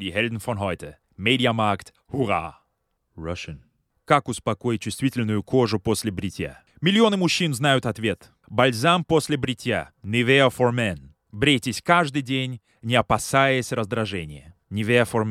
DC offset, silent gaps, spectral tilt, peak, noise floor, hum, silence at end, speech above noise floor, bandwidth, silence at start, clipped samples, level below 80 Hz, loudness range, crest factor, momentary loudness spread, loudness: under 0.1%; none; -5 dB/octave; -2 dBFS; -73 dBFS; none; 0 s; 51 dB; 16 kHz; 0 s; under 0.1%; -52 dBFS; 5 LU; 20 dB; 14 LU; -22 LUFS